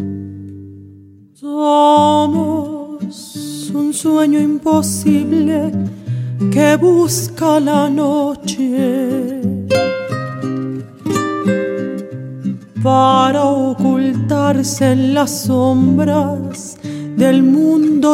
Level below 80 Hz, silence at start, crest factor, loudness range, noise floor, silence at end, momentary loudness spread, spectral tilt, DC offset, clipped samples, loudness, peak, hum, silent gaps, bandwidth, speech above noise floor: -56 dBFS; 0 s; 14 dB; 4 LU; -42 dBFS; 0 s; 14 LU; -6 dB/octave; under 0.1%; under 0.1%; -15 LUFS; 0 dBFS; none; none; 16 kHz; 29 dB